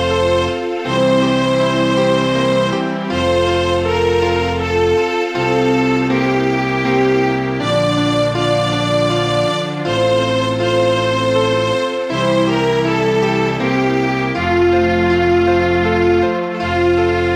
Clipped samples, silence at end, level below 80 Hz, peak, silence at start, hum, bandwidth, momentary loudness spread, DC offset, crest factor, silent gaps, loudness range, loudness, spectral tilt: under 0.1%; 0 s; -38 dBFS; -2 dBFS; 0 s; none; 11.5 kHz; 4 LU; under 0.1%; 12 dB; none; 1 LU; -15 LUFS; -6 dB/octave